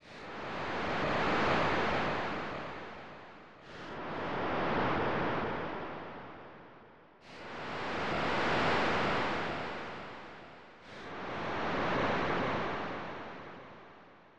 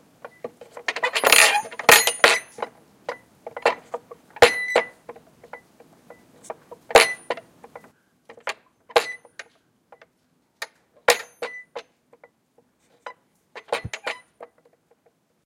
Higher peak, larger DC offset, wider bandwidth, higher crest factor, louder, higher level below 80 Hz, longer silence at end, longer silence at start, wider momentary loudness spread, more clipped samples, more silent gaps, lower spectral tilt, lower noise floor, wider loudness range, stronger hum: second, -20 dBFS vs 0 dBFS; first, 0.3% vs under 0.1%; second, 9.8 kHz vs 16.5 kHz; second, 16 dB vs 24 dB; second, -34 LUFS vs -19 LUFS; about the same, -56 dBFS vs -60 dBFS; second, 0 s vs 1 s; second, 0 s vs 0.25 s; second, 20 LU vs 27 LU; neither; neither; first, -5.5 dB/octave vs 0 dB/octave; second, -57 dBFS vs -67 dBFS; second, 3 LU vs 16 LU; neither